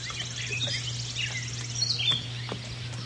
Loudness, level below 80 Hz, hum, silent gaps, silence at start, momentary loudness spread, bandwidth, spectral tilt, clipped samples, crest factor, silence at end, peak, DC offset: -29 LUFS; -54 dBFS; none; none; 0 s; 10 LU; 11.5 kHz; -2 dB/octave; under 0.1%; 18 dB; 0 s; -14 dBFS; under 0.1%